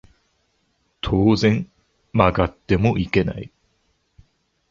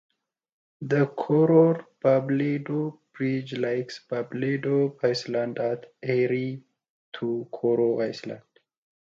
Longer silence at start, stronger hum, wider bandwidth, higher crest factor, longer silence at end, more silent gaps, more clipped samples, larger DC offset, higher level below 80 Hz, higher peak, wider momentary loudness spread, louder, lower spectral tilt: first, 1.05 s vs 0.8 s; neither; about the same, 7.4 kHz vs 7.6 kHz; about the same, 20 dB vs 18 dB; first, 1.25 s vs 0.8 s; second, none vs 6.90-7.12 s; neither; neither; first, -38 dBFS vs -72 dBFS; first, -2 dBFS vs -8 dBFS; first, 16 LU vs 12 LU; first, -20 LUFS vs -26 LUFS; about the same, -7.5 dB/octave vs -7.5 dB/octave